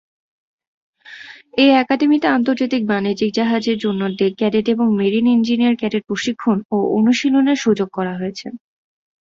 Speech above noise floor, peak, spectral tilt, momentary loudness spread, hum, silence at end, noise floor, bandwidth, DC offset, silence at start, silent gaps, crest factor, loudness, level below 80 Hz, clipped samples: 22 dB; -2 dBFS; -5.5 dB/octave; 10 LU; none; 0.65 s; -39 dBFS; 7.6 kHz; under 0.1%; 1.1 s; 6.65-6.69 s; 16 dB; -17 LUFS; -60 dBFS; under 0.1%